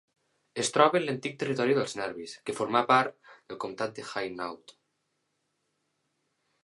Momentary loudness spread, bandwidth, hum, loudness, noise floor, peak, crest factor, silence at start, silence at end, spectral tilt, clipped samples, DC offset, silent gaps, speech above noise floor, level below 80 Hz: 15 LU; 11.5 kHz; none; -29 LUFS; -78 dBFS; -6 dBFS; 26 dB; 0.55 s; 2.1 s; -4 dB/octave; under 0.1%; under 0.1%; none; 49 dB; -76 dBFS